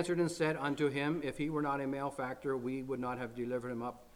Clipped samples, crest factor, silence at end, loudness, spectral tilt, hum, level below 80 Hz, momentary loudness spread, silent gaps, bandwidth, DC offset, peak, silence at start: under 0.1%; 16 dB; 0.05 s; -36 LUFS; -6 dB/octave; none; -64 dBFS; 6 LU; none; 16.5 kHz; under 0.1%; -20 dBFS; 0 s